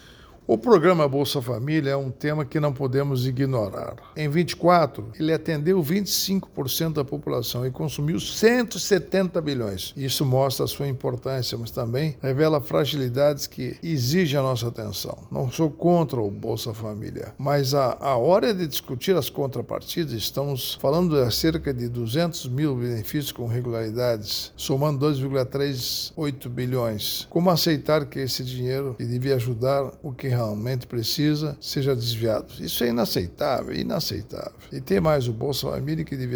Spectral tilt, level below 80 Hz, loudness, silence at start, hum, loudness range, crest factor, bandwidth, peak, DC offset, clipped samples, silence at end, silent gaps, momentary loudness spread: -5.5 dB/octave; -50 dBFS; -24 LUFS; 0.05 s; none; 2 LU; 20 dB; over 20 kHz; -4 dBFS; under 0.1%; under 0.1%; 0 s; none; 8 LU